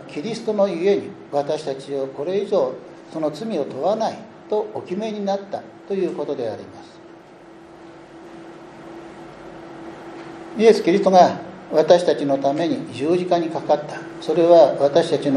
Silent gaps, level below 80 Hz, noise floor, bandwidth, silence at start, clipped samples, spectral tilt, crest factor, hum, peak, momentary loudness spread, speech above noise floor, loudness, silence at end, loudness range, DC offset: none; -66 dBFS; -44 dBFS; 10.5 kHz; 0 s; under 0.1%; -6 dB/octave; 20 dB; none; 0 dBFS; 23 LU; 24 dB; -20 LUFS; 0 s; 18 LU; under 0.1%